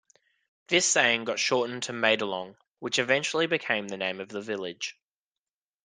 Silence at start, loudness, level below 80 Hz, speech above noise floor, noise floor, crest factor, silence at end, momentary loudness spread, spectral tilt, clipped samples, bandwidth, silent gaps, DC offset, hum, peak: 0.7 s; -27 LUFS; -74 dBFS; over 62 dB; under -90 dBFS; 24 dB; 0.95 s; 14 LU; -2 dB/octave; under 0.1%; 10.5 kHz; 2.70-2.75 s; under 0.1%; none; -6 dBFS